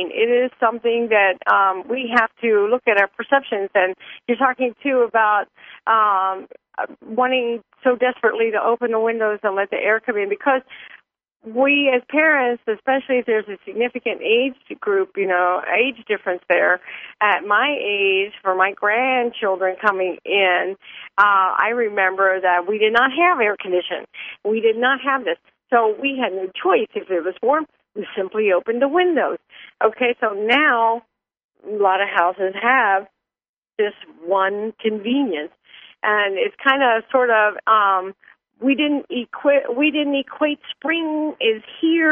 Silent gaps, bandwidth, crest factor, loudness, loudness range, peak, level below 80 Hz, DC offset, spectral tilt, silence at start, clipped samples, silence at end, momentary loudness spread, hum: 31.44-31.49 s, 33.49-33.62 s; 5.6 kHz; 18 dB; -19 LUFS; 3 LU; 0 dBFS; -70 dBFS; under 0.1%; -6 dB/octave; 0 s; under 0.1%; 0 s; 9 LU; none